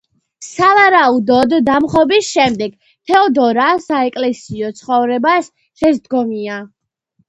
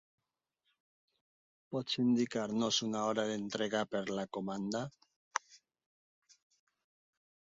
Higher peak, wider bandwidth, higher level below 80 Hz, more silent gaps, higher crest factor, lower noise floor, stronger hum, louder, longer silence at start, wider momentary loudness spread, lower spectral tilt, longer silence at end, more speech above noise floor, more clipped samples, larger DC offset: first, 0 dBFS vs -12 dBFS; first, 11 kHz vs 7.6 kHz; first, -52 dBFS vs -78 dBFS; second, none vs 5.16-5.31 s; second, 14 dB vs 26 dB; second, -63 dBFS vs -86 dBFS; neither; first, -13 LUFS vs -36 LUFS; second, 0.4 s vs 1.7 s; first, 15 LU vs 10 LU; about the same, -4.5 dB/octave vs -3.5 dB/octave; second, 0.65 s vs 1.9 s; about the same, 50 dB vs 50 dB; neither; neither